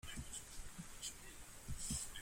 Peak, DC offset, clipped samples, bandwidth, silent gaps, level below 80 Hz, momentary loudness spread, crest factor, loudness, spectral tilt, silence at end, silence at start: -28 dBFS; under 0.1%; under 0.1%; 16.5 kHz; none; -56 dBFS; 11 LU; 20 dB; -49 LUFS; -2 dB/octave; 0 s; 0.05 s